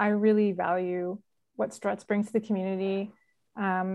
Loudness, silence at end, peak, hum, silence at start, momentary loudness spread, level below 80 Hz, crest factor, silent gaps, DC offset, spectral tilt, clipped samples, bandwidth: -29 LUFS; 0 s; -12 dBFS; none; 0 s; 15 LU; -78 dBFS; 16 dB; none; under 0.1%; -7.5 dB/octave; under 0.1%; 11.5 kHz